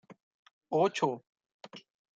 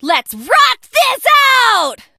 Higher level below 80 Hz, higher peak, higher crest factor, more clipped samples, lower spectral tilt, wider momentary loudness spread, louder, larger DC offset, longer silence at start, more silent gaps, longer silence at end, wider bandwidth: second, -84 dBFS vs -58 dBFS; second, -14 dBFS vs 0 dBFS; first, 22 dB vs 12 dB; neither; first, -5 dB/octave vs 0.5 dB/octave; first, 22 LU vs 7 LU; second, -31 LUFS vs -11 LUFS; neither; about the same, 0.1 s vs 0.05 s; first, 0.23-0.61 s, 1.29-1.33 s, 1.54-1.60 s vs none; about the same, 0.35 s vs 0.25 s; second, 9.2 kHz vs 16 kHz